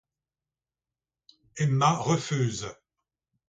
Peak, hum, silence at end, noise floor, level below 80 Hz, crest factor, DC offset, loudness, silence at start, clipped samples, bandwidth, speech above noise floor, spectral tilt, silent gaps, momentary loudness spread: -10 dBFS; none; 0.75 s; under -90 dBFS; -62 dBFS; 22 dB; under 0.1%; -26 LUFS; 1.55 s; under 0.1%; 9.2 kHz; over 64 dB; -5.5 dB/octave; none; 16 LU